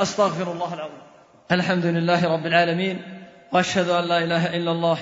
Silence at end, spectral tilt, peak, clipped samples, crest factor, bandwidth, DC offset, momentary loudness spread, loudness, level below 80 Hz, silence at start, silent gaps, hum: 0 s; -5.5 dB/octave; -4 dBFS; under 0.1%; 18 dB; 7.8 kHz; under 0.1%; 13 LU; -22 LUFS; -64 dBFS; 0 s; none; none